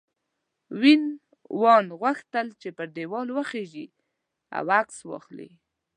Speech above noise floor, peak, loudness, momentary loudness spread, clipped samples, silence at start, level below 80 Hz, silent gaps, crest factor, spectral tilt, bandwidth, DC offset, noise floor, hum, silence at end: 56 dB; -4 dBFS; -24 LUFS; 22 LU; under 0.1%; 0.7 s; -82 dBFS; none; 22 dB; -5 dB/octave; 10 kHz; under 0.1%; -80 dBFS; none; 0.5 s